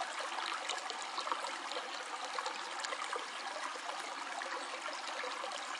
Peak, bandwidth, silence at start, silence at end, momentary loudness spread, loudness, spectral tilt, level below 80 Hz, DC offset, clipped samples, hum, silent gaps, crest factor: -20 dBFS; 11.5 kHz; 0 s; 0 s; 3 LU; -40 LUFS; 1.5 dB/octave; under -90 dBFS; under 0.1%; under 0.1%; none; none; 22 dB